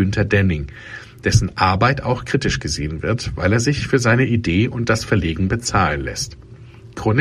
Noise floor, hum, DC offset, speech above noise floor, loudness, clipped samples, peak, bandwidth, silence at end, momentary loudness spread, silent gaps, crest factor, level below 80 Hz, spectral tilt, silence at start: -40 dBFS; none; under 0.1%; 22 dB; -19 LUFS; under 0.1%; 0 dBFS; 13.5 kHz; 0 s; 10 LU; none; 18 dB; -34 dBFS; -5.5 dB/octave; 0 s